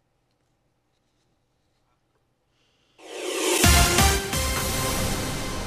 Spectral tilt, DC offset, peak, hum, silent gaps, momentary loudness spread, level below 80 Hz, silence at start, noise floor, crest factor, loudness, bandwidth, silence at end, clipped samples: -3 dB/octave; under 0.1%; -6 dBFS; none; none; 13 LU; -32 dBFS; 3.05 s; -70 dBFS; 20 dB; -21 LUFS; 16 kHz; 0 s; under 0.1%